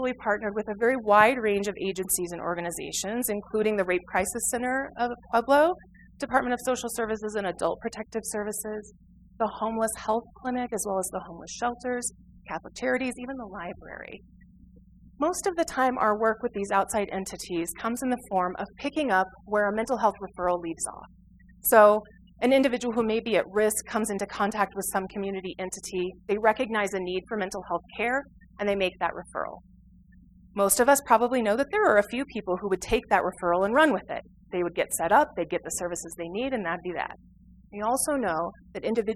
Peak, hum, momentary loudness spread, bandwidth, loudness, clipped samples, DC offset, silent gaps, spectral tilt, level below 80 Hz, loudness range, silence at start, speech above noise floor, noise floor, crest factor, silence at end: -4 dBFS; none; 13 LU; 16 kHz; -27 LUFS; under 0.1%; under 0.1%; none; -3.5 dB/octave; -54 dBFS; 7 LU; 0 s; 27 dB; -54 dBFS; 22 dB; 0 s